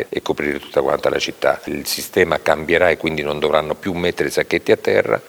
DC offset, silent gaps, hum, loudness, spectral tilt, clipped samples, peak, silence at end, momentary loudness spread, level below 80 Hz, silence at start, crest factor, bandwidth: under 0.1%; none; none; -18 LUFS; -4 dB/octave; under 0.1%; 0 dBFS; 0 s; 6 LU; -46 dBFS; 0 s; 18 dB; over 20 kHz